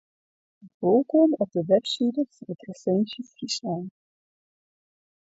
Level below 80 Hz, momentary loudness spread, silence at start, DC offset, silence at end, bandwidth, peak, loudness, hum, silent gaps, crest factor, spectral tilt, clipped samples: -72 dBFS; 15 LU; 0.65 s; under 0.1%; 1.35 s; 8 kHz; -8 dBFS; -25 LUFS; none; 0.74-0.80 s; 18 dB; -6 dB/octave; under 0.1%